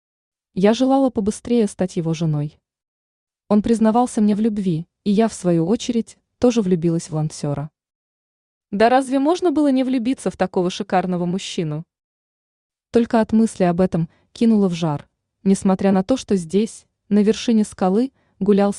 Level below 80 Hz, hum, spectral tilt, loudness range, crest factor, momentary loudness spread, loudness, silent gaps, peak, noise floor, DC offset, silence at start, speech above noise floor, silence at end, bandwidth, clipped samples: -52 dBFS; none; -6.5 dB/octave; 3 LU; 16 dB; 8 LU; -19 LUFS; 2.88-3.27 s, 7.95-8.61 s, 12.04-12.70 s; -2 dBFS; under -90 dBFS; under 0.1%; 0.55 s; over 72 dB; 0 s; 11 kHz; under 0.1%